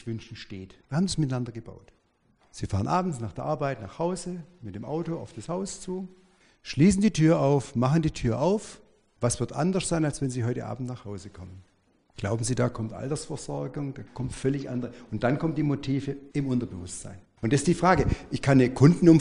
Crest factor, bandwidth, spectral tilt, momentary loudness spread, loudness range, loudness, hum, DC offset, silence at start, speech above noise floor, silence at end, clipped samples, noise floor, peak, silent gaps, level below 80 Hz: 22 dB; 10.5 kHz; -6.5 dB/octave; 18 LU; 8 LU; -27 LUFS; none; under 0.1%; 0 s; 40 dB; 0 s; under 0.1%; -66 dBFS; -4 dBFS; none; -48 dBFS